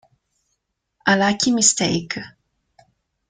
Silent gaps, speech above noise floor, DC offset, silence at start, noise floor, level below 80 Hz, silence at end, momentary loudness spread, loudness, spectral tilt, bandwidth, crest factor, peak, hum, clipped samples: none; 56 dB; under 0.1%; 1.05 s; -74 dBFS; -58 dBFS; 1 s; 15 LU; -18 LUFS; -2.5 dB/octave; 9.8 kHz; 20 dB; -2 dBFS; none; under 0.1%